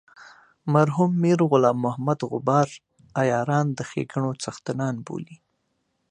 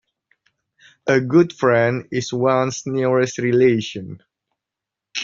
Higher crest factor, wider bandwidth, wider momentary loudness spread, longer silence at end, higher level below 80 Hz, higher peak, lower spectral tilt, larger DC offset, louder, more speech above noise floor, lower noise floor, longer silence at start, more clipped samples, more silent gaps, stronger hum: about the same, 20 dB vs 18 dB; first, 10 kHz vs 7.6 kHz; about the same, 13 LU vs 13 LU; first, 0.75 s vs 0 s; second, -66 dBFS vs -60 dBFS; about the same, -4 dBFS vs -2 dBFS; first, -7 dB/octave vs -5.5 dB/octave; neither; second, -23 LUFS vs -18 LUFS; second, 51 dB vs 67 dB; second, -73 dBFS vs -85 dBFS; second, 0.2 s vs 1.05 s; neither; neither; neither